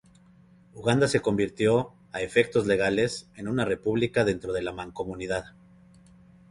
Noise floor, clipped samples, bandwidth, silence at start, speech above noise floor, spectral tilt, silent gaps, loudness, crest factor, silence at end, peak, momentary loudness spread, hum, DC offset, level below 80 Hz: -56 dBFS; under 0.1%; 11.5 kHz; 0.75 s; 30 dB; -5.5 dB/octave; none; -27 LUFS; 20 dB; 1 s; -8 dBFS; 11 LU; none; under 0.1%; -54 dBFS